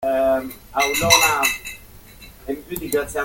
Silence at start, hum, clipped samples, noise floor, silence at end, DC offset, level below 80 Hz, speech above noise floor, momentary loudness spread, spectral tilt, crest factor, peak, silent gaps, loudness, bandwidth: 0 s; none; under 0.1%; -43 dBFS; 0 s; under 0.1%; -44 dBFS; 23 dB; 19 LU; -2 dB/octave; 20 dB; 0 dBFS; none; -18 LUFS; 17 kHz